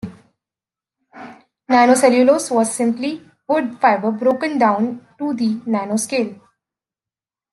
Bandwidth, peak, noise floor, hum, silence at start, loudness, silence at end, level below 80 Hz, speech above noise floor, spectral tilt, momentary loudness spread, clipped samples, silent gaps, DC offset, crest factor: 12.5 kHz; -2 dBFS; under -90 dBFS; none; 0.05 s; -17 LUFS; 1.2 s; -68 dBFS; over 73 dB; -4.5 dB/octave; 13 LU; under 0.1%; none; under 0.1%; 18 dB